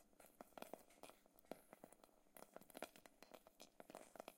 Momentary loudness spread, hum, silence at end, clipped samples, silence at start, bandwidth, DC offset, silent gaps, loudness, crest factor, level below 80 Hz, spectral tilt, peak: 9 LU; none; 0 s; under 0.1%; 0 s; 16.5 kHz; under 0.1%; none; -62 LUFS; 30 dB; -86 dBFS; -3 dB/octave; -32 dBFS